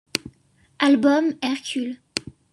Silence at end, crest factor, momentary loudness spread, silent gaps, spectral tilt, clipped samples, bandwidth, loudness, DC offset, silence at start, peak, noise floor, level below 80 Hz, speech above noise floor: 0.2 s; 20 dB; 13 LU; none; -3.5 dB/octave; under 0.1%; 12 kHz; -22 LUFS; under 0.1%; 0.15 s; -2 dBFS; -59 dBFS; -62 dBFS; 39 dB